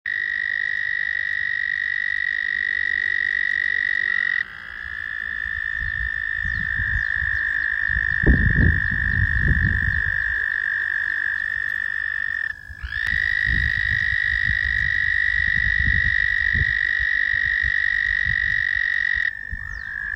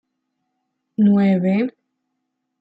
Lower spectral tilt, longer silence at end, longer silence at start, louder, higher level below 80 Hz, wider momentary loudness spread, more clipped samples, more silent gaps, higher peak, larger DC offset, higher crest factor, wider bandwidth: second, -5.5 dB/octave vs -10.5 dB/octave; second, 0 s vs 0.9 s; second, 0.05 s vs 1 s; about the same, -20 LUFS vs -18 LUFS; first, -32 dBFS vs -66 dBFS; second, 6 LU vs 12 LU; neither; neither; first, -4 dBFS vs -8 dBFS; neither; about the same, 18 dB vs 14 dB; first, 8.6 kHz vs 4.8 kHz